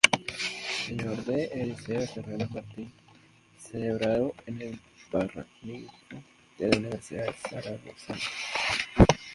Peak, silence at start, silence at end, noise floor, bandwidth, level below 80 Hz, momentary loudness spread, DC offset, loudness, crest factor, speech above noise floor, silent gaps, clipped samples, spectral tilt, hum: 0 dBFS; 0.05 s; 0 s; -58 dBFS; 11.5 kHz; -44 dBFS; 17 LU; under 0.1%; -30 LUFS; 30 dB; 28 dB; none; under 0.1%; -4.5 dB/octave; none